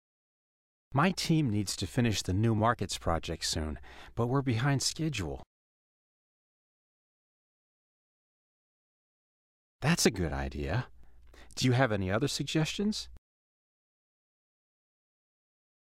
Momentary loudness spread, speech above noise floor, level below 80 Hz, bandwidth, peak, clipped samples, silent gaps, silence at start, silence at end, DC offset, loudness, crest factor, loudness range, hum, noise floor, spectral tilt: 11 LU; 22 dB; -50 dBFS; 16 kHz; -10 dBFS; under 0.1%; 5.46-9.79 s; 0.9 s; 2.65 s; under 0.1%; -31 LUFS; 22 dB; 7 LU; none; -52 dBFS; -5 dB/octave